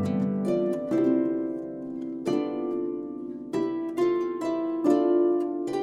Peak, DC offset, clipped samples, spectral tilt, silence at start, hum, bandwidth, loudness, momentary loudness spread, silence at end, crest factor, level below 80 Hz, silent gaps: -10 dBFS; under 0.1%; under 0.1%; -8 dB/octave; 0 s; none; 10.5 kHz; -27 LUFS; 11 LU; 0 s; 16 dB; -68 dBFS; none